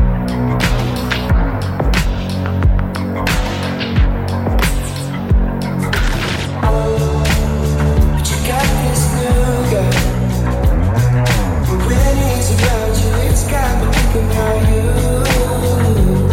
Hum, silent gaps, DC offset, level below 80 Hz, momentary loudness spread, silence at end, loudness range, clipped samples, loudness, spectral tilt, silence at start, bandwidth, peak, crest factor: none; none; under 0.1%; -18 dBFS; 4 LU; 0 s; 3 LU; under 0.1%; -15 LUFS; -5.5 dB/octave; 0 s; 16.5 kHz; -4 dBFS; 10 dB